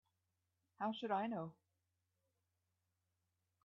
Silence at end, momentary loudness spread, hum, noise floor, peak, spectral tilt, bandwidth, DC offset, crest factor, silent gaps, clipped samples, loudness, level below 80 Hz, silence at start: 2.1 s; 8 LU; none; -88 dBFS; -28 dBFS; -4 dB/octave; 5.8 kHz; under 0.1%; 20 dB; none; under 0.1%; -43 LUFS; under -90 dBFS; 0.8 s